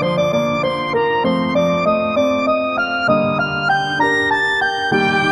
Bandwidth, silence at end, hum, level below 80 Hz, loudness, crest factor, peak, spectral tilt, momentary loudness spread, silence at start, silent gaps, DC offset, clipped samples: 12.5 kHz; 0 s; none; -50 dBFS; -16 LUFS; 14 dB; -4 dBFS; -5.5 dB/octave; 3 LU; 0 s; none; under 0.1%; under 0.1%